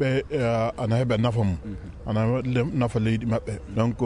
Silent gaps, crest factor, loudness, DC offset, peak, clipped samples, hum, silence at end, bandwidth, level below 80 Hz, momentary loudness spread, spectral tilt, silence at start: none; 14 dB; -25 LUFS; under 0.1%; -10 dBFS; under 0.1%; none; 0 s; 10.5 kHz; -44 dBFS; 7 LU; -8 dB/octave; 0 s